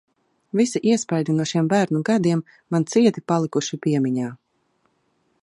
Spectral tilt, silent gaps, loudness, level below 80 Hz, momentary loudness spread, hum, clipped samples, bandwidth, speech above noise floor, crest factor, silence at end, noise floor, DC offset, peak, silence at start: -6 dB/octave; none; -21 LUFS; -68 dBFS; 7 LU; none; under 0.1%; 11.5 kHz; 47 dB; 18 dB; 1.05 s; -68 dBFS; under 0.1%; -4 dBFS; 0.55 s